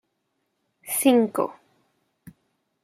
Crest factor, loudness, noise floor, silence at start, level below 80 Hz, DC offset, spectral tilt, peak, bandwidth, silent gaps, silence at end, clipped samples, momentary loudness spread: 20 dB; -22 LUFS; -76 dBFS; 0.85 s; -74 dBFS; under 0.1%; -3.5 dB/octave; -6 dBFS; 16 kHz; none; 0.55 s; under 0.1%; 13 LU